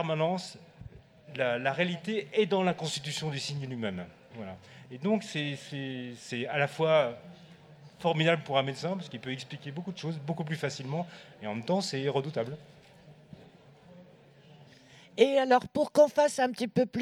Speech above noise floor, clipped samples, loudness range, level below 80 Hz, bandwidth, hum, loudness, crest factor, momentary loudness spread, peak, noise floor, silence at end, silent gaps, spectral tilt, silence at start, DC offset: 26 dB; under 0.1%; 7 LU; -70 dBFS; 13.5 kHz; none; -30 LUFS; 22 dB; 18 LU; -10 dBFS; -56 dBFS; 0 s; none; -5.5 dB/octave; 0 s; under 0.1%